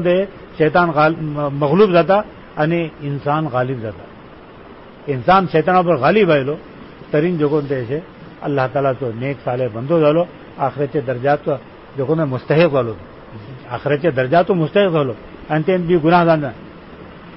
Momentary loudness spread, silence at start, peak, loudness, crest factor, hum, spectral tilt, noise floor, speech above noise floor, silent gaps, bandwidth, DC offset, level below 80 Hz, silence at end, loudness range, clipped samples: 18 LU; 0 s; -2 dBFS; -17 LUFS; 14 dB; none; -12 dB/octave; -39 dBFS; 23 dB; none; 5.8 kHz; 0.1%; -48 dBFS; 0 s; 3 LU; under 0.1%